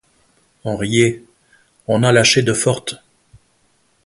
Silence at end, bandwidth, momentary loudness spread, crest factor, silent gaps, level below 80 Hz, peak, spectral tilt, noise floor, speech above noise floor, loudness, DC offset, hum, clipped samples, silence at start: 1.1 s; 11.5 kHz; 21 LU; 18 dB; none; -50 dBFS; 0 dBFS; -4 dB/octave; -60 dBFS; 45 dB; -16 LUFS; under 0.1%; none; under 0.1%; 0.65 s